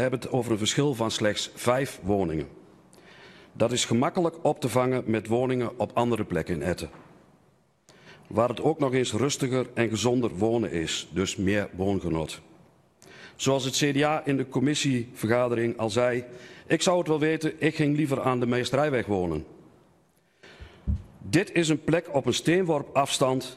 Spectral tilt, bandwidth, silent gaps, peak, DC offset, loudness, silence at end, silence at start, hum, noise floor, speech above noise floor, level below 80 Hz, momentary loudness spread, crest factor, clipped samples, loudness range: -5 dB/octave; 14 kHz; none; -8 dBFS; under 0.1%; -26 LUFS; 0 s; 0 s; none; -64 dBFS; 39 dB; -50 dBFS; 7 LU; 20 dB; under 0.1%; 4 LU